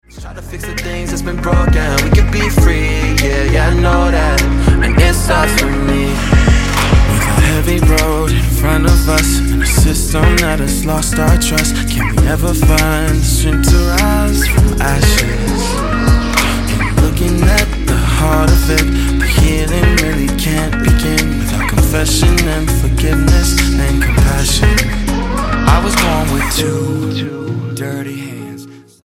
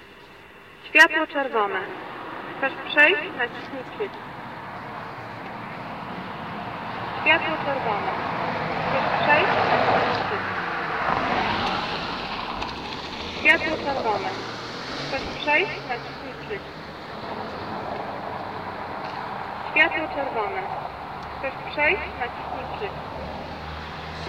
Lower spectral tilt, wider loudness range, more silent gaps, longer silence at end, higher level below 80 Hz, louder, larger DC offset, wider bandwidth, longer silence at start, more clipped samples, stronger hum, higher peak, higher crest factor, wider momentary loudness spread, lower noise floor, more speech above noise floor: about the same, -5 dB/octave vs -4.5 dB/octave; second, 2 LU vs 10 LU; neither; first, 0.25 s vs 0 s; first, -14 dBFS vs -50 dBFS; first, -13 LUFS vs -24 LUFS; neither; about the same, 17 kHz vs 16 kHz; first, 0.15 s vs 0 s; neither; neither; first, 0 dBFS vs -4 dBFS; second, 12 dB vs 22 dB; second, 6 LU vs 16 LU; second, -34 dBFS vs -46 dBFS; about the same, 23 dB vs 22 dB